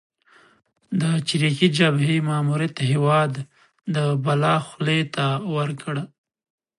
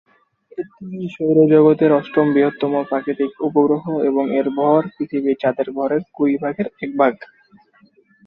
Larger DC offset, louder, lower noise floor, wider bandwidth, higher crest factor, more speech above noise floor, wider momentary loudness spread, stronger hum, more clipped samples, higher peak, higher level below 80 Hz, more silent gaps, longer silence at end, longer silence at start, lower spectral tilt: neither; second, -22 LUFS vs -18 LUFS; about the same, -56 dBFS vs -54 dBFS; first, 11.5 kHz vs 4.5 kHz; about the same, 20 dB vs 16 dB; about the same, 35 dB vs 37 dB; second, 11 LU vs 16 LU; neither; neither; about the same, -2 dBFS vs -2 dBFS; about the same, -68 dBFS vs -64 dBFS; neither; second, 0.75 s vs 1.05 s; first, 0.9 s vs 0.6 s; second, -6 dB/octave vs -10 dB/octave